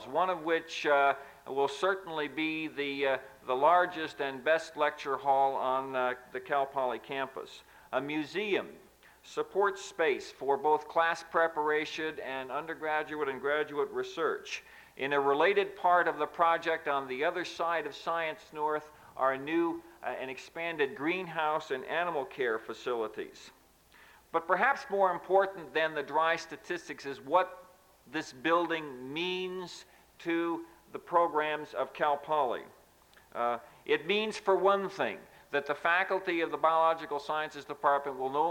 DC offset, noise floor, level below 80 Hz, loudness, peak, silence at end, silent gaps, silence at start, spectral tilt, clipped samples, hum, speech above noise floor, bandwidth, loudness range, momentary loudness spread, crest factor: under 0.1%; -61 dBFS; -72 dBFS; -32 LUFS; -12 dBFS; 0 s; none; 0 s; -4 dB/octave; under 0.1%; none; 30 dB; 17 kHz; 4 LU; 11 LU; 20 dB